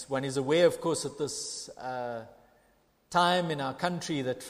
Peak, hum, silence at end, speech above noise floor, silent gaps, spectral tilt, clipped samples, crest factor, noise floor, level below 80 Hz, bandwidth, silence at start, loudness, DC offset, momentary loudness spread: -12 dBFS; none; 0 s; 37 dB; none; -4 dB/octave; under 0.1%; 20 dB; -67 dBFS; -68 dBFS; 15.5 kHz; 0 s; -30 LUFS; under 0.1%; 13 LU